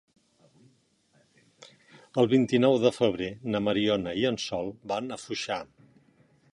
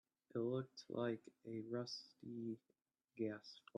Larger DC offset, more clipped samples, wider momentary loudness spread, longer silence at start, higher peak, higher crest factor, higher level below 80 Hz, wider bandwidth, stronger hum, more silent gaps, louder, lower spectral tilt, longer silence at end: neither; neither; about the same, 11 LU vs 10 LU; first, 1.6 s vs 0.35 s; first, -8 dBFS vs -30 dBFS; about the same, 22 dB vs 18 dB; first, -62 dBFS vs under -90 dBFS; first, 11 kHz vs 9.4 kHz; neither; neither; first, -27 LUFS vs -48 LUFS; about the same, -5.5 dB/octave vs -6.5 dB/octave; first, 0.9 s vs 0.2 s